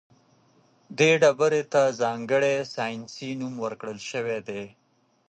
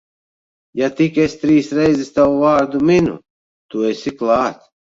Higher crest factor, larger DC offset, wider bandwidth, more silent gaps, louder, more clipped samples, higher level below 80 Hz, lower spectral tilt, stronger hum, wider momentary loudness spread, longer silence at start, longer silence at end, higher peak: about the same, 20 dB vs 16 dB; neither; first, 9 kHz vs 7.8 kHz; second, none vs 3.30-3.69 s; second, -25 LUFS vs -16 LUFS; neither; second, -72 dBFS vs -50 dBFS; second, -4.5 dB/octave vs -6.5 dB/octave; neither; first, 16 LU vs 8 LU; first, 0.9 s vs 0.75 s; first, 0.6 s vs 0.4 s; second, -6 dBFS vs -2 dBFS